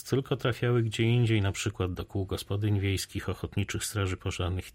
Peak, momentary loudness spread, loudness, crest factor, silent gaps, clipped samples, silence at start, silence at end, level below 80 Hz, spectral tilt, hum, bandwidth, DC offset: -14 dBFS; 8 LU; -30 LUFS; 14 dB; none; under 0.1%; 0 s; 0.05 s; -50 dBFS; -5.5 dB/octave; none; 16 kHz; under 0.1%